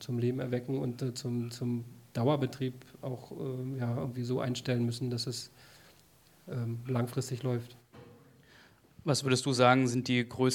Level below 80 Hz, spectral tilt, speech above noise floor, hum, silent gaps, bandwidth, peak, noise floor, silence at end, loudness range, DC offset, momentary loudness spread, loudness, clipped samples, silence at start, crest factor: -70 dBFS; -5.5 dB/octave; 30 dB; none; none; 17 kHz; -10 dBFS; -62 dBFS; 0 s; 7 LU; under 0.1%; 13 LU; -33 LUFS; under 0.1%; 0 s; 24 dB